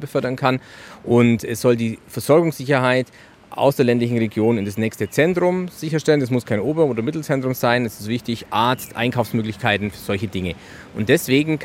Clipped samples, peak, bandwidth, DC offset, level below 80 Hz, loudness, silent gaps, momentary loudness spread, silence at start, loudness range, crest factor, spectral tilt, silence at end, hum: under 0.1%; -2 dBFS; 16.5 kHz; under 0.1%; -56 dBFS; -20 LUFS; none; 9 LU; 0 s; 3 LU; 18 dB; -6 dB/octave; 0 s; none